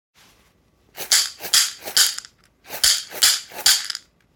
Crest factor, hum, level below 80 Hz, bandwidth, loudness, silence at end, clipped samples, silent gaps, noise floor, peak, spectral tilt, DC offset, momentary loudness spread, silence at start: 22 dB; none; -58 dBFS; 19 kHz; -17 LUFS; 0.4 s; under 0.1%; none; -60 dBFS; 0 dBFS; 3 dB/octave; under 0.1%; 15 LU; 0.95 s